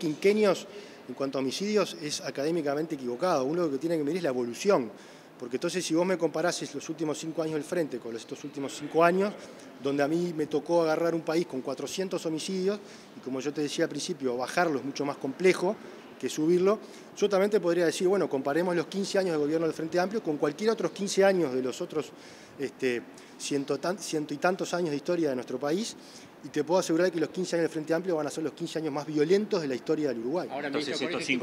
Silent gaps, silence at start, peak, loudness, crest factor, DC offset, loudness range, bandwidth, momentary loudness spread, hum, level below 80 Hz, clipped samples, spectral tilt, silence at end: none; 0 s; -8 dBFS; -29 LUFS; 20 dB; under 0.1%; 4 LU; 16 kHz; 12 LU; none; -80 dBFS; under 0.1%; -5 dB/octave; 0 s